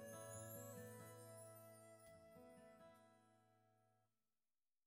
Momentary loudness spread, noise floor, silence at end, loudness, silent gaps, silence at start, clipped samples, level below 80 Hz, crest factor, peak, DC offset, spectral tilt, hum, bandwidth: 11 LU; under -90 dBFS; 0.8 s; -59 LUFS; none; 0 s; under 0.1%; under -90 dBFS; 18 dB; -44 dBFS; under 0.1%; -4.5 dB/octave; none; 16 kHz